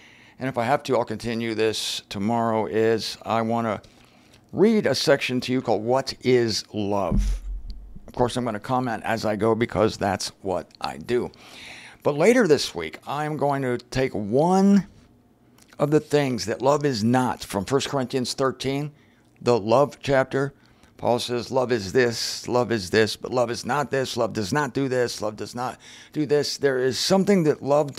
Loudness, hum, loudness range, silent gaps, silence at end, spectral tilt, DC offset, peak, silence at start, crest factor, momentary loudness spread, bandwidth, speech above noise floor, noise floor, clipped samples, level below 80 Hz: -23 LUFS; none; 3 LU; none; 0.05 s; -5 dB/octave; under 0.1%; -4 dBFS; 0.4 s; 18 dB; 11 LU; 16 kHz; 34 dB; -57 dBFS; under 0.1%; -42 dBFS